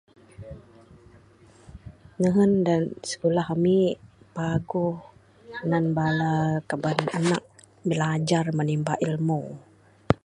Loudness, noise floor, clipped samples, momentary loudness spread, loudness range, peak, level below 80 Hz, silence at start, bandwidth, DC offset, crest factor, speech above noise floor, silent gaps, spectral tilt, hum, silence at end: -25 LUFS; -54 dBFS; under 0.1%; 22 LU; 2 LU; 0 dBFS; -54 dBFS; 0.4 s; 11 kHz; under 0.1%; 24 dB; 30 dB; none; -6.5 dB/octave; none; 0.1 s